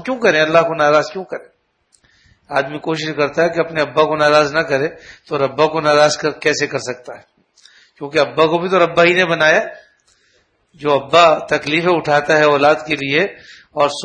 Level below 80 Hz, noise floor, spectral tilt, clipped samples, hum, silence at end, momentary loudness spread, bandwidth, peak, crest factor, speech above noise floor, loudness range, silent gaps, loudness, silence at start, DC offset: -56 dBFS; -60 dBFS; -4 dB/octave; under 0.1%; none; 0 s; 12 LU; 10 kHz; 0 dBFS; 16 dB; 44 dB; 4 LU; none; -15 LUFS; 0 s; under 0.1%